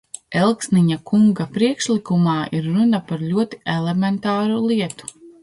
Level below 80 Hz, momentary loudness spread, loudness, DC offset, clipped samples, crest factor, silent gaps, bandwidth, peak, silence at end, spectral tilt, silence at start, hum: -58 dBFS; 6 LU; -19 LUFS; under 0.1%; under 0.1%; 16 dB; none; 11.5 kHz; -4 dBFS; 0.1 s; -6 dB/octave; 0.3 s; none